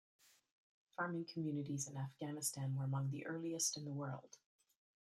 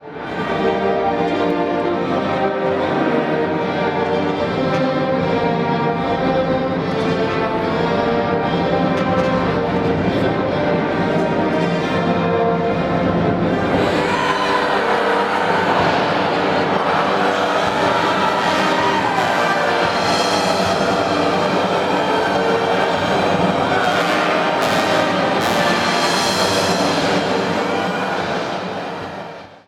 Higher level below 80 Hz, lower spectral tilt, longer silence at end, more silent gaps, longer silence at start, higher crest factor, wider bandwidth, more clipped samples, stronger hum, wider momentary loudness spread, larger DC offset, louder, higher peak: second, -86 dBFS vs -46 dBFS; about the same, -4.5 dB/octave vs -5 dB/octave; first, 0.8 s vs 0.15 s; neither; first, 1 s vs 0 s; about the same, 18 dB vs 14 dB; second, 14 kHz vs 16.5 kHz; neither; neither; first, 7 LU vs 3 LU; neither; second, -43 LUFS vs -17 LUFS; second, -26 dBFS vs -4 dBFS